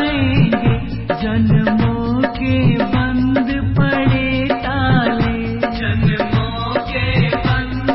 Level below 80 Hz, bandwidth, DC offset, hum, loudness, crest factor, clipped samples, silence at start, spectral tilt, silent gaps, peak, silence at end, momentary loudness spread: -28 dBFS; 5.8 kHz; under 0.1%; none; -16 LUFS; 14 dB; under 0.1%; 0 s; -12 dB/octave; none; -2 dBFS; 0 s; 5 LU